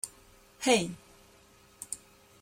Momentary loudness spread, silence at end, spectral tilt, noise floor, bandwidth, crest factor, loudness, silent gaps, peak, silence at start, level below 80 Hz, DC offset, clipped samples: 20 LU; 0.45 s; -3 dB/octave; -60 dBFS; 16.5 kHz; 22 dB; -31 LUFS; none; -12 dBFS; 0.05 s; -66 dBFS; under 0.1%; under 0.1%